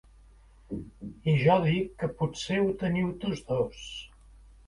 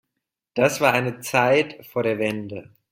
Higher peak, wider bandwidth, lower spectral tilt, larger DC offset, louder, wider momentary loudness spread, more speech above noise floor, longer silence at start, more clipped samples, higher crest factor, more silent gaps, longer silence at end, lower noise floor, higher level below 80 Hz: second, -10 dBFS vs -4 dBFS; second, 11 kHz vs 16.5 kHz; first, -6.5 dB/octave vs -4.5 dB/octave; neither; second, -28 LUFS vs -22 LUFS; first, 18 LU vs 13 LU; second, 28 dB vs 60 dB; first, 0.7 s vs 0.55 s; neither; about the same, 20 dB vs 20 dB; neither; first, 0.6 s vs 0.3 s; second, -55 dBFS vs -82 dBFS; first, -52 dBFS vs -60 dBFS